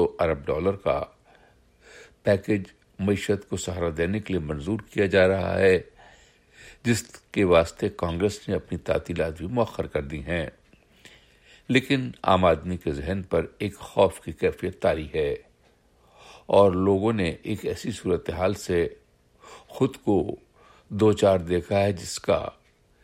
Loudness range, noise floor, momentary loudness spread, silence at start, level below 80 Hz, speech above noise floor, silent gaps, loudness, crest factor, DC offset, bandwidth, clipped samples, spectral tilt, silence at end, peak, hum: 4 LU; -61 dBFS; 10 LU; 0 s; -48 dBFS; 37 dB; none; -25 LUFS; 20 dB; under 0.1%; 16 kHz; under 0.1%; -6 dB/octave; 0.5 s; -6 dBFS; none